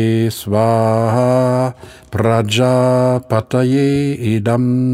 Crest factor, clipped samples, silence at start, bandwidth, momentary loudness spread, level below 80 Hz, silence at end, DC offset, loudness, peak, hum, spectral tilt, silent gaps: 14 dB; under 0.1%; 0 s; 15.5 kHz; 5 LU; -50 dBFS; 0 s; under 0.1%; -15 LUFS; 0 dBFS; none; -7 dB/octave; none